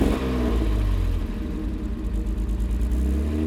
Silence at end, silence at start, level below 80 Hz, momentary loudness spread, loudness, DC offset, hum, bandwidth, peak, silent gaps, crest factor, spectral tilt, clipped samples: 0 s; 0 s; -24 dBFS; 6 LU; -26 LUFS; under 0.1%; none; 13 kHz; -8 dBFS; none; 16 dB; -7.5 dB/octave; under 0.1%